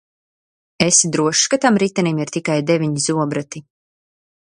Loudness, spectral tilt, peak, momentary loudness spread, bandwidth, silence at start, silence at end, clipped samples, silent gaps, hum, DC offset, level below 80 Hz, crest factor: -17 LUFS; -3.5 dB/octave; 0 dBFS; 10 LU; 11.5 kHz; 0.8 s; 1 s; under 0.1%; none; none; under 0.1%; -60 dBFS; 20 dB